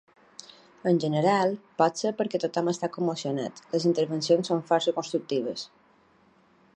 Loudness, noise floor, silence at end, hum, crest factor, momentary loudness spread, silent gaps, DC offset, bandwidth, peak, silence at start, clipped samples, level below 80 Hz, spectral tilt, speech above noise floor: -27 LUFS; -61 dBFS; 1.1 s; none; 20 dB; 10 LU; none; under 0.1%; 9.8 kHz; -8 dBFS; 0.85 s; under 0.1%; -76 dBFS; -5.5 dB/octave; 35 dB